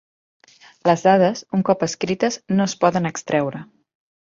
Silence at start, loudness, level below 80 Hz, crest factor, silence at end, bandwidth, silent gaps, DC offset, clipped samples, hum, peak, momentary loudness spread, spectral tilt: 0.85 s; -20 LUFS; -62 dBFS; 18 dB; 0.7 s; 7.8 kHz; none; under 0.1%; under 0.1%; none; -2 dBFS; 8 LU; -5.5 dB/octave